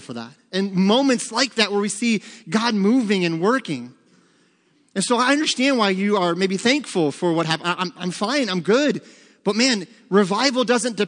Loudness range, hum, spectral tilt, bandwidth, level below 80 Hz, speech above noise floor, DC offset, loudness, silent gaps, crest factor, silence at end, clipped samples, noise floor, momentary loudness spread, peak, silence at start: 2 LU; none; -4 dB/octave; 10.5 kHz; -76 dBFS; 40 dB; under 0.1%; -20 LUFS; none; 20 dB; 0 s; under 0.1%; -61 dBFS; 8 LU; -2 dBFS; 0 s